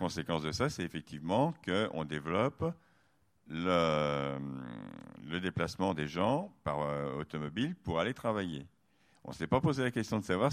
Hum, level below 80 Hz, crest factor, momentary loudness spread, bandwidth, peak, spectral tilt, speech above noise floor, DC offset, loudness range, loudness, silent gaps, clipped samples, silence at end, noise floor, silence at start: none; -60 dBFS; 20 dB; 13 LU; 15 kHz; -14 dBFS; -6 dB/octave; 38 dB; under 0.1%; 2 LU; -34 LUFS; none; under 0.1%; 0 s; -72 dBFS; 0 s